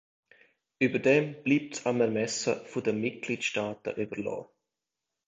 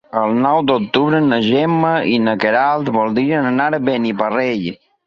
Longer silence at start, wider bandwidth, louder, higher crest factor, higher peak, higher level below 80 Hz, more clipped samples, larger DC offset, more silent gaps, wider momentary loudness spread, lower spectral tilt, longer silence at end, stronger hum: first, 0.8 s vs 0.15 s; first, 9 kHz vs 6.8 kHz; second, -29 LUFS vs -16 LUFS; first, 20 dB vs 14 dB; second, -10 dBFS vs -2 dBFS; second, -70 dBFS vs -58 dBFS; neither; neither; neither; first, 10 LU vs 4 LU; second, -4.5 dB/octave vs -7.5 dB/octave; first, 0.85 s vs 0.3 s; neither